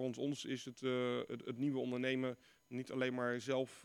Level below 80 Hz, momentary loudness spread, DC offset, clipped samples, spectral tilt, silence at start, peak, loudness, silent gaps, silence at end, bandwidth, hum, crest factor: -84 dBFS; 7 LU; under 0.1%; under 0.1%; -5.5 dB/octave; 0 s; -24 dBFS; -40 LUFS; none; 0 s; 12.5 kHz; none; 16 dB